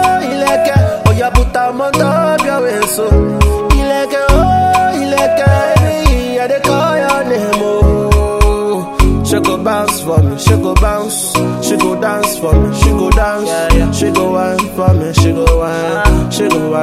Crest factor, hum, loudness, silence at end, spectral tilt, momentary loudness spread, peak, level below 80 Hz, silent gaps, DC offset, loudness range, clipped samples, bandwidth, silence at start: 10 dB; none; -12 LUFS; 0 s; -5.5 dB/octave; 4 LU; 0 dBFS; -16 dBFS; none; under 0.1%; 1 LU; 0.3%; 16 kHz; 0 s